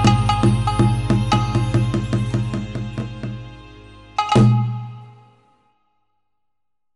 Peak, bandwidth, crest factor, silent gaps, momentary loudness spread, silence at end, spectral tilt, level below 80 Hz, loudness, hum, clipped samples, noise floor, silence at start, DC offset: -2 dBFS; 11.5 kHz; 18 dB; none; 16 LU; 1.85 s; -7 dB/octave; -34 dBFS; -19 LUFS; none; under 0.1%; -82 dBFS; 0 s; under 0.1%